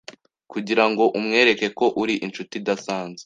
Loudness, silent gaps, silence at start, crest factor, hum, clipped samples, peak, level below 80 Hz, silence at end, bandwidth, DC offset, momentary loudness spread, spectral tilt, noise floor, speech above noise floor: -21 LUFS; none; 0.1 s; 20 dB; none; under 0.1%; -2 dBFS; -66 dBFS; 0.05 s; 9.4 kHz; under 0.1%; 12 LU; -4 dB/octave; -44 dBFS; 23 dB